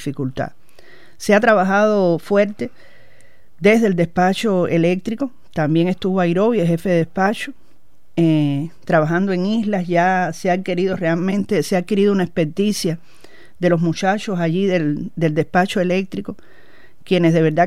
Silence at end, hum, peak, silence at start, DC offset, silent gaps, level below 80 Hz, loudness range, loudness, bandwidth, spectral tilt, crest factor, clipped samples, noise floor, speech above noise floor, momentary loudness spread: 0 s; none; -2 dBFS; 0 s; 2%; none; -54 dBFS; 2 LU; -18 LUFS; 14.5 kHz; -6.5 dB/octave; 16 dB; under 0.1%; -58 dBFS; 40 dB; 10 LU